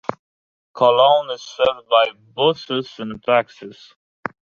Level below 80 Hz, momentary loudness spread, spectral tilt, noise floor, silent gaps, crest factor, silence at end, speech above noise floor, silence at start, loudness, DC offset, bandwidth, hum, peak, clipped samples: -64 dBFS; 18 LU; -4.5 dB/octave; under -90 dBFS; 0.19-0.74 s; 18 dB; 0.85 s; over 72 dB; 0.1 s; -18 LUFS; under 0.1%; 7 kHz; none; -2 dBFS; under 0.1%